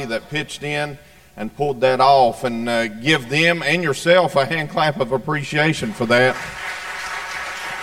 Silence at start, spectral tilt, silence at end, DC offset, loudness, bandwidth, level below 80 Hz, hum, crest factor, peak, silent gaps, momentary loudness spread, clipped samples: 0 s; -4.5 dB/octave; 0 s; 0.5%; -19 LUFS; 16.5 kHz; -52 dBFS; none; 16 dB; -2 dBFS; none; 12 LU; under 0.1%